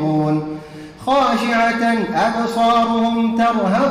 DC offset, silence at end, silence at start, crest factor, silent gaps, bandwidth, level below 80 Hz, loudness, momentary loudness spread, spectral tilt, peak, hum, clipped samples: under 0.1%; 0 s; 0 s; 10 dB; none; 13.5 kHz; -50 dBFS; -17 LUFS; 10 LU; -6 dB/octave; -6 dBFS; none; under 0.1%